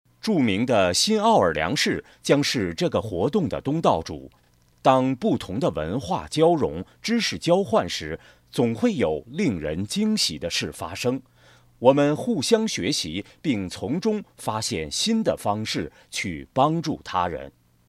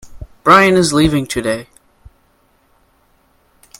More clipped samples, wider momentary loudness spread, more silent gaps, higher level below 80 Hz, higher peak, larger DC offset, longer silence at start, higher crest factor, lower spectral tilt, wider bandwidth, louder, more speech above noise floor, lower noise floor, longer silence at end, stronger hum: neither; second, 9 LU vs 12 LU; neither; second, -52 dBFS vs -38 dBFS; about the same, -2 dBFS vs 0 dBFS; neither; first, 0.25 s vs 0.05 s; first, 22 dB vs 16 dB; about the same, -4.5 dB/octave vs -4.5 dB/octave; second, 15 kHz vs 17 kHz; second, -23 LUFS vs -13 LUFS; second, 32 dB vs 44 dB; about the same, -55 dBFS vs -56 dBFS; second, 0.4 s vs 2.15 s; neither